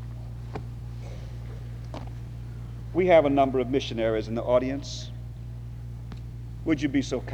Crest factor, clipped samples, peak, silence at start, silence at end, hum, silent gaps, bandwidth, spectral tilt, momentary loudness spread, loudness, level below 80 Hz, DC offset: 20 dB; under 0.1%; -8 dBFS; 0 s; 0 s; none; none; 10.5 kHz; -6.5 dB/octave; 18 LU; -26 LUFS; -42 dBFS; under 0.1%